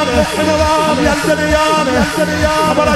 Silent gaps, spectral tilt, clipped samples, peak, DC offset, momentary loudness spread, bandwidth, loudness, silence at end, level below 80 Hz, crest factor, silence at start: none; -4.5 dB/octave; under 0.1%; 0 dBFS; under 0.1%; 2 LU; 16 kHz; -13 LUFS; 0 s; -28 dBFS; 12 dB; 0 s